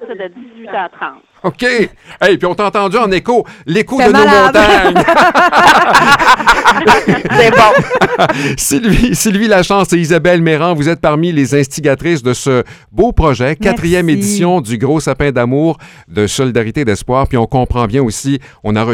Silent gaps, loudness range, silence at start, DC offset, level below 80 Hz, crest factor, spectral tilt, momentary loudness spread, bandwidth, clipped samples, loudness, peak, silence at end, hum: none; 7 LU; 0 s; under 0.1%; -30 dBFS; 10 dB; -5 dB/octave; 11 LU; 18.5 kHz; 0.5%; -10 LUFS; 0 dBFS; 0 s; none